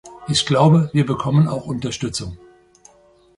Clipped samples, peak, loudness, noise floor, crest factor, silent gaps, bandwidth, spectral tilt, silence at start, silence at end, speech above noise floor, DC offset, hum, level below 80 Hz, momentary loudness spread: under 0.1%; -2 dBFS; -18 LUFS; -53 dBFS; 18 dB; none; 11.5 kHz; -6 dB/octave; 0.05 s; 1 s; 35 dB; under 0.1%; none; -48 dBFS; 12 LU